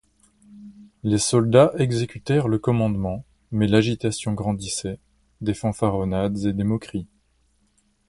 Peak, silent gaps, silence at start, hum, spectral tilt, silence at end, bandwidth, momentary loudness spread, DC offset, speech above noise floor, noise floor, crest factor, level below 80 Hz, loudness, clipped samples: -2 dBFS; none; 0.5 s; none; -6 dB/octave; 1.05 s; 11.5 kHz; 13 LU; under 0.1%; 43 dB; -65 dBFS; 20 dB; -46 dBFS; -22 LUFS; under 0.1%